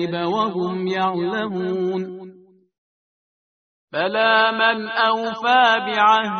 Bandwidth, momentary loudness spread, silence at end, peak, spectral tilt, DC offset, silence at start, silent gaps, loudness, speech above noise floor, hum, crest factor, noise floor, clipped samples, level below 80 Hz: 6.6 kHz; 9 LU; 0 s; -2 dBFS; -2 dB/octave; under 0.1%; 0 s; 2.78-3.88 s; -19 LUFS; over 71 dB; none; 18 dB; under -90 dBFS; under 0.1%; -68 dBFS